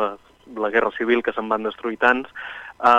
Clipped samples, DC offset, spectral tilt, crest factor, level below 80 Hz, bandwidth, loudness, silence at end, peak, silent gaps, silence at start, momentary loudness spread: under 0.1%; under 0.1%; -5 dB/octave; 18 dB; -58 dBFS; 9.4 kHz; -22 LUFS; 0 s; -2 dBFS; none; 0 s; 15 LU